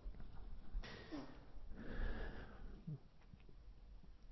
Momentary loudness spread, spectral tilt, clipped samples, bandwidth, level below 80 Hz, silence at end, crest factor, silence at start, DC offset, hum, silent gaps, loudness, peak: 15 LU; -5.5 dB/octave; under 0.1%; 6 kHz; -52 dBFS; 0 s; 16 dB; 0 s; under 0.1%; none; none; -55 LUFS; -32 dBFS